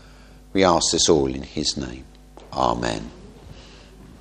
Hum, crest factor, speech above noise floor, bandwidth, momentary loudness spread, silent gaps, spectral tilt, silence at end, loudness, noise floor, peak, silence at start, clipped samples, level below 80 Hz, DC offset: none; 24 dB; 25 dB; 11 kHz; 16 LU; none; -3.5 dB/octave; 0.05 s; -21 LUFS; -46 dBFS; 0 dBFS; 0.55 s; under 0.1%; -42 dBFS; under 0.1%